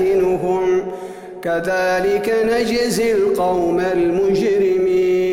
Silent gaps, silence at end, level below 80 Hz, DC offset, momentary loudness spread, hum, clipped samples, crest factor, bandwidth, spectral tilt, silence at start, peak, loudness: none; 0 s; -46 dBFS; under 0.1%; 5 LU; none; under 0.1%; 10 dB; 15.5 kHz; -5.5 dB/octave; 0 s; -8 dBFS; -17 LUFS